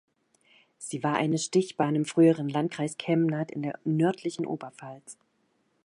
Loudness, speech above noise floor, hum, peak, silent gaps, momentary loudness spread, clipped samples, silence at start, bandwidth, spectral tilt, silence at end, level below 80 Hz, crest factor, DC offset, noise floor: -27 LUFS; 45 dB; none; -10 dBFS; none; 20 LU; under 0.1%; 0.8 s; 11 kHz; -6 dB/octave; 0.7 s; -76 dBFS; 18 dB; under 0.1%; -72 dBFS